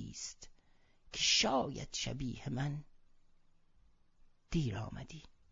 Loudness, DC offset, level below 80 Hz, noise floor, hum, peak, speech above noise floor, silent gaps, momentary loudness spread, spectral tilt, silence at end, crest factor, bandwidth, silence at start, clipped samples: -36 LUFS; under 0.1%; -56 dBFS; -67 dBFS; none; -18 dBFS; 29 dB; none; 20 LU; -3 dB/octave; 0.25 s; 22 dB; 7.8 kHz; 0 s; under 0.1%